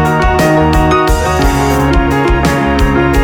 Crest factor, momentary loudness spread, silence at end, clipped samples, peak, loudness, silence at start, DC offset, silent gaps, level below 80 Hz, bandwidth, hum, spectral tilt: 10 dB; 2 LU; 0 s; under 0.1%; 0 dBFS; -11 LUFS; 0 s; 0.2%; none; -16 dBFS; 18.5 kHz; none; -6 dB/octave